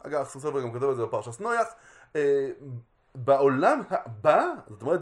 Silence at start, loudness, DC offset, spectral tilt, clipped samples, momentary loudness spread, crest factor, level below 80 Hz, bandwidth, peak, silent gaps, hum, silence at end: 0.05 s; -26 LUFS; under 0.1%; -6.5 dB/octave; under 0.1%; 12 LU; 20 dB; -70 dBFS; 11.5 kHz; -6 dBFS; none; none; 0 s